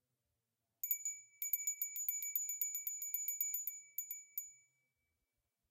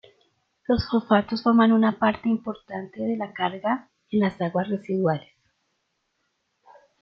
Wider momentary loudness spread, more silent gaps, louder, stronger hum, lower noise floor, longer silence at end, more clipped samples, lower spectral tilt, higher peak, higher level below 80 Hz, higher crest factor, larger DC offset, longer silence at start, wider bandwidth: second, 8 LU vs 12 LU; neither; second, -40 LUFS vs -24 LUFS; neither; first, -89 dBFS vs -75 dBFS; second, 1.15 s vs 1.8 s; neither; second, 5 dB/octave vs -9 dB/octave; second, -22 dBFS vs -6 dBFS; second, under -90 dBFS vs -54 dBFS; about the same, 24 dB vs 20 dB; neither; first, 0.85 s vs 0.7 s; first, 17 kHz vs 6 kHz